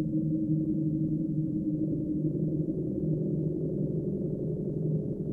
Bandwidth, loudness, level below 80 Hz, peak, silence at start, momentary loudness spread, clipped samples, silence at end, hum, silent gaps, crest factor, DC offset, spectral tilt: 1.1 kHz; -31 LUFS; -52 dBFS; -18 dBFS; 0 s; 3 LU; under 0.1%; 0 s; none; none; 12 dB; under 0.1%; -14 dB/octave